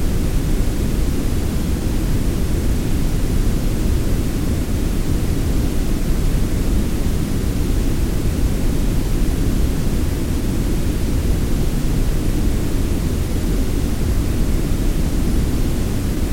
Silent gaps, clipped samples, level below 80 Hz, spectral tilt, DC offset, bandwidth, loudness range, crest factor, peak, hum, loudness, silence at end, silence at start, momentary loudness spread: none; under 0.1%; -20 dBFS; -6 dB/octave; under 0.1%; 17 kHz; 0 LU; 12 dB; -6 dBFS; none; -21 LUFS; 0 s; 0 s; 1 LU